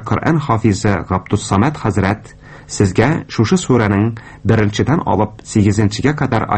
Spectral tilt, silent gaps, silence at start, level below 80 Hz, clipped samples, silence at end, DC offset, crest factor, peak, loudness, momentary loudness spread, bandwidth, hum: -6.5 dB/octave; none; 0 s; -38 dBFS; under 0.1%; 0 s; under 0.1%; 14 dB; 0 dBFS; -16 LUFS; 5 LU; 8.8 kHz; none